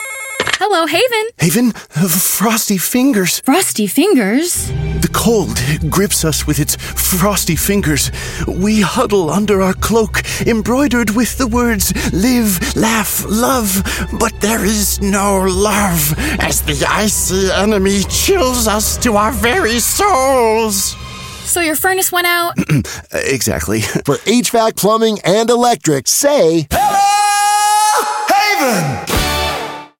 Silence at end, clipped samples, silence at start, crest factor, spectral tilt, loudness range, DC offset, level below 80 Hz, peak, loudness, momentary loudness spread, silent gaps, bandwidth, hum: 0.15 s; under 0.1%; 0 s; 12 dB; -3.5 dB/octave; 2 LU; under 0.1%; -28 dBFS; 0 dBFS; -13 LUFS; 5 LU; none; 17 kHz; none